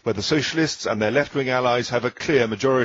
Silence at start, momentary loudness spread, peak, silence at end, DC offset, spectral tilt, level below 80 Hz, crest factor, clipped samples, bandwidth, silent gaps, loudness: 0.05 s; 3 LU; -4 dBFS; 0 s; under 0.1%; -4.5 dB/octave; -54 dBFS; 16 dB; under 0.1%; 7.8 kHz; none; -21 LUFS